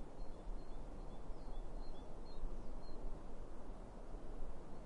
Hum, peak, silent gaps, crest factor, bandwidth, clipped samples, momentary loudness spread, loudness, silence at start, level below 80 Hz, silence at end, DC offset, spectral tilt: none; -30 dBFS; none; 12 dB; 5.4 kHz; under 0.1%; 3 LU; -54 LUFS; 0 s; -48 dBFS; 0 s; under 0.1%; -7 dB/octave